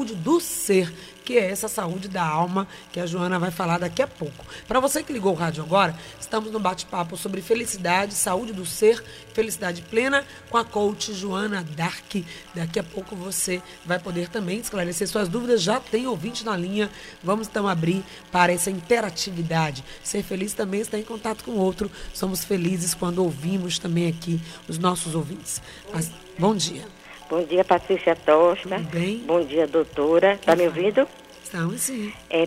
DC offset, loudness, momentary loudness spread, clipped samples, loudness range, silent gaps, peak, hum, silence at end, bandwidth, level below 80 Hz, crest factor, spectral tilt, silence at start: under 0.1%; -24 LUFS; 10 LU; under 0.1%; 5 LU; none; -4 dBFS; none; 0 s; 16 kHz; -52 dBFS; 20 dB; -4.5 dB/octave; 0 s